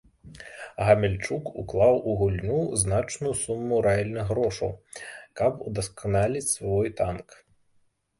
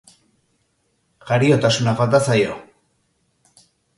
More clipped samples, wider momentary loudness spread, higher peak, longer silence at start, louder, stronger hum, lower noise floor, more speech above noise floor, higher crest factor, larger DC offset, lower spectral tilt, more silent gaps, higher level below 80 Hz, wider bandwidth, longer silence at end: neither; first, 18 LU vs 8 LU; second, -6 dBFS vs -2 dBFS; second, 0.25 s vs 1.25 s; second, -26 LUFS vs -17 LUFS; neither; about the same, -66 dBFS vs -67 dBFS; second, 41 dB vs 50 dB; about the same, 22 dB vs 18 dB; neither; about the same, -5.5 dB/octave vs -5.5 dB/octave; neither; first, -46 dBFS vs -56 dBFS; about the same, 12 kHz vs 11.5 kHz; second, 0.85 s vs 1.35 s